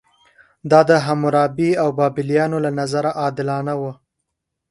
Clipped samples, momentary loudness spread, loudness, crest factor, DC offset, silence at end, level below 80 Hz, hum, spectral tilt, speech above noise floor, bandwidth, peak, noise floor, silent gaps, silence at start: under 0.1%; 10 LU; -18 LUFS; 18 dB; under 0.1%; 0.75 s; -60 dBFS; none; -7 dB/octave; 60 dB; 11.5 kHz; 0 dBFS; -77 dBFS; none; 0.65 s